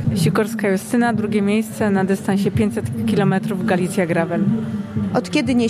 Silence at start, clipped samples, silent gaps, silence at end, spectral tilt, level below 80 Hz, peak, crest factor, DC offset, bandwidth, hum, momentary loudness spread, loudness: 0 s; under 0.1%; none; 0 s; -6.5 dB/octave; -48 dBFS; -4 dBFS; 14 dB; under 0.1%; 14.5 kHz; none; 3 LU; -19 LUFS